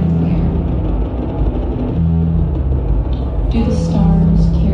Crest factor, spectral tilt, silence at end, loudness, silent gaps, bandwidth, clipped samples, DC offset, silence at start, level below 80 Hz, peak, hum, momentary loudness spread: 12 dB; -9.5 dB/octave; 0 s; -16 LUFS; none; 7 kHz; under 0.1%; under 0.1%; 0 s; -18 dBFS; -2 dBFS; none; 7 LU